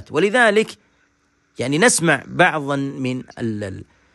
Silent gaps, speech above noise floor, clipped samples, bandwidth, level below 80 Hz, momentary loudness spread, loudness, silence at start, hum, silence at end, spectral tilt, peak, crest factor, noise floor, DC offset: none; 44 dB; under 0.1%; 12.5 kHz; -60 dBFS; 13 LU; -18 LUFS; 0 s; none; 0.3 s; -4 dB/octave; 0 dBFS; 20 dB; -63 dBFS; under 0.1%